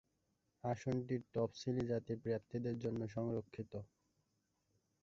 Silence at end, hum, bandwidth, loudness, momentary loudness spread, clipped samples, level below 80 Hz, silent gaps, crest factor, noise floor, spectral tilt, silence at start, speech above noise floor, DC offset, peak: 1.2 s; none; 7.6 kHz; -42 LUFS; 9 LU; under 0.1%; -70 dBFS; none; 18 dB; -84 dBFS; -7.5 dB/octave; 0.65 s; 42 dB; under 0.1%; -26 dBFS